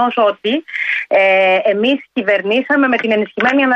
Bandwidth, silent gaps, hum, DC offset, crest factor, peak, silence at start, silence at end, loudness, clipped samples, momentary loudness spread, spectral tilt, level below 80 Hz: 7.6 kHz; none; none; under 0.1%; 12 dB; -2 dBFS; 0 s; 0 s; -14 LUFS; under 0.1%; 6 LU; -5.5 dB/octave; -62 dBFS